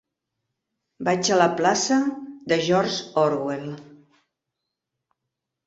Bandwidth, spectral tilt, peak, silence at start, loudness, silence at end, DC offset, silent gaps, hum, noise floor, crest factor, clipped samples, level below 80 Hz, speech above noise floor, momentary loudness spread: 8 kHz; -4 dB/octave; -4 dBFS; 1 s; -22 LUFS; 1.7 s; under 0.1%; none; none; -83 dBFS; 22 dB; under 0.1%; -66 dBFS; 61 dB; 13 LU